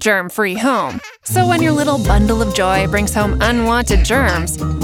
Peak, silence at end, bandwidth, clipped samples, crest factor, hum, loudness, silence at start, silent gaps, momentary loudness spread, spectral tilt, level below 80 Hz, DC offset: -2 dBFS; 0 s; 17 kHz; under 0.1%; 14 dB; none; -15 LUFS; 0 s; none; 5 LU; -5 dB/octave; -22 dBFS; under 0.1%